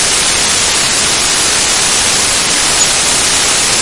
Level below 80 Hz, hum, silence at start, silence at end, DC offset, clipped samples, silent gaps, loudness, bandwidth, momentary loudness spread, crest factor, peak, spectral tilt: -34 dBFS; none; 0 s; 0 s; 0.8%; under 0.1%; none; -8 LUFS; 12 kHz; 1 LU; 12 dB; 0 dBFS; 0 dB/octave